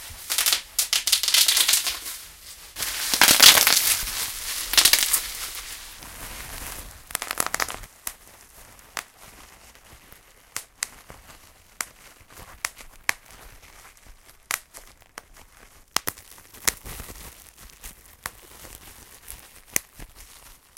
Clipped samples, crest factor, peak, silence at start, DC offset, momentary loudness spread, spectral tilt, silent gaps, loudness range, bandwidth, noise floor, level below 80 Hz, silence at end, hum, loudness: under 0.1%; 26 dB; 0 dBFS; 0 s; under 0.1%; 26 LU; 1.5 dB/octave; none; 21 LU; 17 kHz; -52 dBFS; -50 dBFS; 0.55 s; none; -20 LUFS